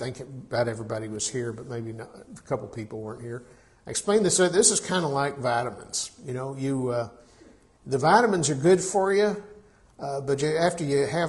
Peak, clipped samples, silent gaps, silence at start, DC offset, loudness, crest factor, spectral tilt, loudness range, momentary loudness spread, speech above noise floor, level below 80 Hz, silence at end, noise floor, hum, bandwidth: -4 dBFS; under 0.1%; none; 0 s; under 0.1%; -25 LUFS; 22 dB; -4 dB/octave; 8 LU; 17 LU; 29 dB; -60 dBFS; 0 s; -55 dBFS; none; 11.5 kHz